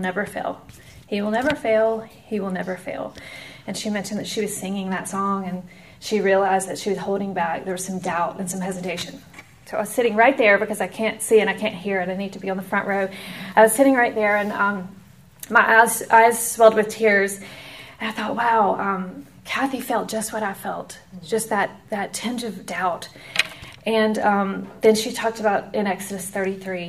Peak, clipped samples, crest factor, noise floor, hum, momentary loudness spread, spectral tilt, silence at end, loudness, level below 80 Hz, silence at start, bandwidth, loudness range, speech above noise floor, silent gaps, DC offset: 0 dBFS; under 0.1%; 22 dB; -43 dBFS; none; 16 LU; -4 dB/octave; 0 s; -21 LUFS; -60 dBFS; 0 s; 15.5 kHz; 9 LU; 22 dB; none; 0.1%